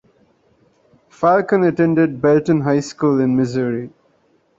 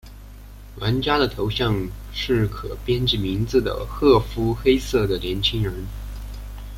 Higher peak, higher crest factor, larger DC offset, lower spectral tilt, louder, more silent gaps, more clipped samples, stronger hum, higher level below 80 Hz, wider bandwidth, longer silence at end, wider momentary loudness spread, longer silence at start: about the same, -2 dBFS vs -4 dBFS; about the same, 16 dB vs 18 dB; neither; first, -7.5 dB/octave vs -6 dB/octave; first, -17 LUFS vs -22 LUFS; neither; neither; second, none vs 50 Hz at -35 dBFS; second, -56 dBFS vs -34 dBFS; second, 7.8 kHz vs 16.5 kHz; first, 0.7 s vs 0 s; second, 7 LU vs 15 LU; first, 1.2 s vs 0.05 s